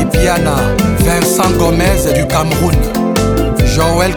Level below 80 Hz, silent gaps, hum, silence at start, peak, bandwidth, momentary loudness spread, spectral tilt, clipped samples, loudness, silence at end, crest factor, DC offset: -18 dBFS; none; none; 0 s; 0 dBFS; over 20 kHz; 2 LU; -5 dB/octave; under 0.1%; -12 LUFS; 0 s; 12 dB; under 0.1%